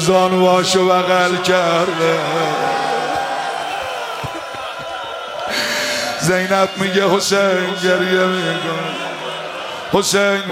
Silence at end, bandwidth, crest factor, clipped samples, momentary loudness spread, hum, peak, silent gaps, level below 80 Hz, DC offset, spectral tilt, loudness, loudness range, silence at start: 0 s; 16.5 kHz; 16 dB; under 0.1%; 12 LU; none; 0 dBFS; none; -56 dBFS; under 0.1%; -3.5 dB/octave; -17 LUFS; 6 LU; 0 s